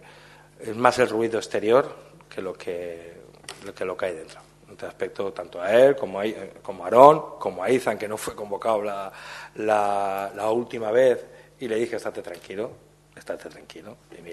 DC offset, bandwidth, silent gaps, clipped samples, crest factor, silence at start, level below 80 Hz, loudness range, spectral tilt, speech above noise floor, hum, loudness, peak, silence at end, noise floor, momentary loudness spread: under 0.1%; 12.5 kHz; none; under 0.1%; 24 dB; 0.6 s; -64 dBFS; 12 LU; -5 dB/octave; 26 dB; 50 Hz at -60 dBFS; -23 LUFS; 0 dBFS; 0 s; -50 dBFS; 21 LU